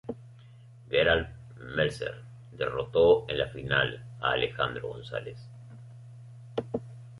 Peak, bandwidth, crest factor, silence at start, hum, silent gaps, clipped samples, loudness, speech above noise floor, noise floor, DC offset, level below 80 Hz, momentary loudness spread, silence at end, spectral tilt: -10 dBFS; 11.5 kHz; 22 dB; 0.05 s; none; none; under 0.1%; -29 LUFS; 23 dB; -51 dBFS; under 0.1%; -52 dBFS; 24 LU; 0 s; -6 dB/octave